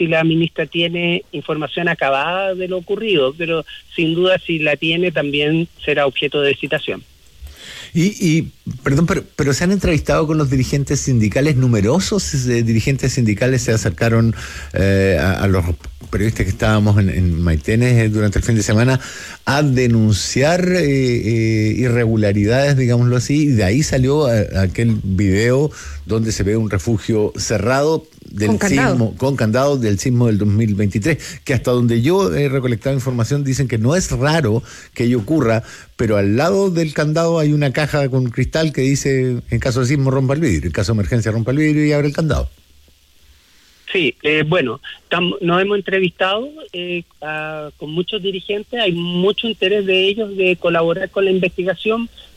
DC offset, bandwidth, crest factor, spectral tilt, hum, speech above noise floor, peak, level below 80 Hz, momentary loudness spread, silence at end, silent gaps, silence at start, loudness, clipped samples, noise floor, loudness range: under 0.1%; 14.5 kHz; 12 dB; -6 dB/octave; none; 34 dB; -4 dBFS; -36 dBFS; 8 LU; 0.15 s; none; 0 s; -17 LUFS; under 0.1%; -50 dBFS; 4 LU